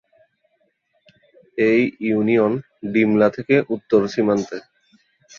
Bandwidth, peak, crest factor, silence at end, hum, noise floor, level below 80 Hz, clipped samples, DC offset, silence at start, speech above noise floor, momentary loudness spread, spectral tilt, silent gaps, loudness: 7.2 kHz; -2 dBFS; 18 dB; 0.8 s; none; -67 dBFS; -62 dBFS; under 0.1%; under 0.1%; 1.55 s; 48 dB; 9 LU; -7 dB/octave; none; -19 LUFS